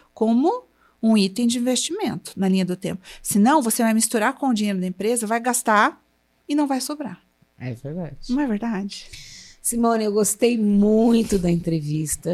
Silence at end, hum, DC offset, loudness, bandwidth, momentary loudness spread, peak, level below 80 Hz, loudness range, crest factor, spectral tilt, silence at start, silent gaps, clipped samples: 0 s; none; under 0.1%; -21 LUFS; 15.5 kHz; 14 LU; -4 dBFS; -48 dBFS; 7 LU; 18 dB; -4.5 dB/octave; 0.15 s; none; under 0.1%